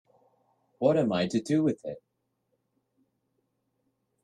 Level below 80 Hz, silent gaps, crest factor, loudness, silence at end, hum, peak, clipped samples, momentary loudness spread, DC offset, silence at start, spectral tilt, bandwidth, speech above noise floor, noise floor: -72 dBFS; none; 20 dB; -27 LUFS; 2.25 s; none; -12 dBFS; under 0.1%; 15 LU; under 0.1%; 0.8 s; -6.5 dB/octave; 10.5 kHz; 51 dB; -78 dBFS